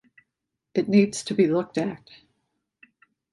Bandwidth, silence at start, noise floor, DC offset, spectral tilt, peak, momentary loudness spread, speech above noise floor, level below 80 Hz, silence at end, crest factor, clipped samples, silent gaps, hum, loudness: 11.5 kHz; 0.75 s; -83 dBFS; under 0.1%; -6 dB/octave; -6 dBFS; 10 LU; 60 dB; -68 dBFS; 1.35 s; 20 dB; under 0.1%; none; none; -24 LUFS